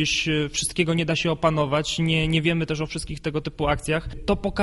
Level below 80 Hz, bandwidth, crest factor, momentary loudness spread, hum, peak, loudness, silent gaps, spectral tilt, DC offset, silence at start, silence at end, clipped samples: -40 dBFS; 11.5 kHz; 16 dB; 7 LU; none; -8 dBFS; -24 LUFS; none; -4.5 dB/octave; under 0.1%; 0 s; 0 s; under 0.1%